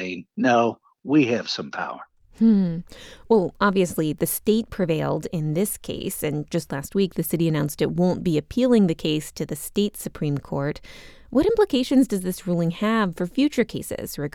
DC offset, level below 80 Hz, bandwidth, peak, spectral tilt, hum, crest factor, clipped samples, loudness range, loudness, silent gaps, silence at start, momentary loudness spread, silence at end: under 0.1%; -48 dBFS; 18.5 kHz; -6 dBFS; -6 dB/octave; none; 16 dB; under 0.1%; 2 LU; -23 LUFS; none; 0 s; 11 LU; 0.05 s